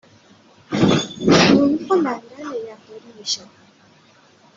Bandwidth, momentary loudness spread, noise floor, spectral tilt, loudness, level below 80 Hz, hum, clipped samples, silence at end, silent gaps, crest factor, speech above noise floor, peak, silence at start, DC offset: 7.8 kHz; 18 LU; -52 dBFS; -5 dB/octave; -18 LUFS; -52 dBFS; none; under 0.1%; 1.2 s; none; 18 dB; 28 dB; -2 dBFS; 0.7 s; under 0.1%